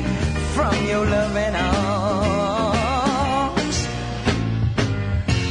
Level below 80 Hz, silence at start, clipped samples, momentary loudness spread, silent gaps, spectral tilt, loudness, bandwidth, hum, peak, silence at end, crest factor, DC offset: -32 dBFS; 0 s; under 0.1%; 3 LU; none; -5.5 dB/octave; -21 LUFS; 11 kHz; none; -6 dBFS; 0 s; 14 dB; under 0.1%